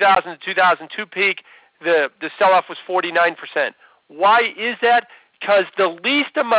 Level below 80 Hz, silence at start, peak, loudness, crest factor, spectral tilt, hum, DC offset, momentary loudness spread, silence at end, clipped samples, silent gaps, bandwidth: -70 dBFS; 0 s; -6 dBFS; -18 LUFS; 12 dB; -6.5 dB/octave; none; under 0.1%; 8 LU; 0 s; under 0.1%; none; 4 kHz